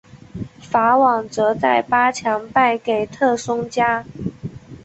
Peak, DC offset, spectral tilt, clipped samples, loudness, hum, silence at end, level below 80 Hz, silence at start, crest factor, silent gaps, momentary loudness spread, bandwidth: -2 dBFS; under 0.1%; -5 dB/octave; under 0.1%; -18 LUFS; none; 0.05 s; -52 dBFS; 0.15 s; 16 dB; none; 18 LU; 8.2 kHz